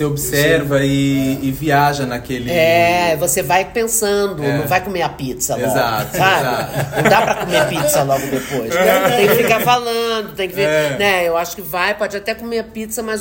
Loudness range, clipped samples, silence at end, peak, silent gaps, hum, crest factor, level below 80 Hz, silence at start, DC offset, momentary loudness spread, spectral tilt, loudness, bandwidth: 2 LU; under 0.1%; 0 s; 0 dBFS; none; none; 16 dB; -42 dBFS; 0 s; under 0.1%; 9 LU; -4 dB/octave; -16 LUFS; 16.5 kHz